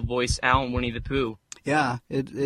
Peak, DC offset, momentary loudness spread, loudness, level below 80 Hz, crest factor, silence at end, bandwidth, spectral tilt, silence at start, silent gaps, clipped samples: -4 dBFS; under 0.1%; 8 LU; -25 LUFS; -38 dBFS; 20 dB; 0 s; 13 kHz; -5 dB/octave; 0 s; none; under 0.1%